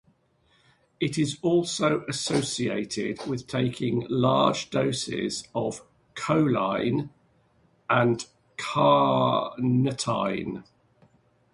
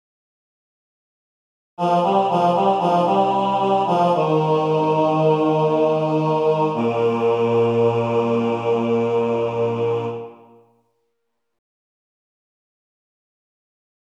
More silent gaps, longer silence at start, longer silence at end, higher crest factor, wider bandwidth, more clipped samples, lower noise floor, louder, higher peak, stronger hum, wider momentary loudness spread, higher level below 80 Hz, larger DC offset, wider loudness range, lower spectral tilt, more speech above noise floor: neither; second, 1 s vs 1.8 s; second, 0.9 s vs 3.8 s; first, 20 dB vs 14 dB; first, 11.5 kHz vs 9.2 kHz; neither; second, -65 dBFS vs -76 dBFS; second, -26 LUFS vs -19 LUFS; about the same, -6 dBFS vs -6 dBFS; neither; first, 11 LU vs 4 LU; first, -60 dBFS vs -70 dBFS; neither; second, 3 LU vs 7 LU; second, -5.5 dB/octave vs -8 dB/octave; second, 40 dB vs 59 dB